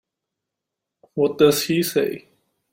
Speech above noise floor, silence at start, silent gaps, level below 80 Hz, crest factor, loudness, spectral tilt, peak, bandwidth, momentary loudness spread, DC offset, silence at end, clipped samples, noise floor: 65 dB; 1.15 s; none; -62 dBFS; 20 dB; -20 LUFS; -4.5 dB/octave; -2 dBFS; 16.5 kHz; 15 LU; under 0.1%; 0.55 s; under 0.1%; -84 dBFS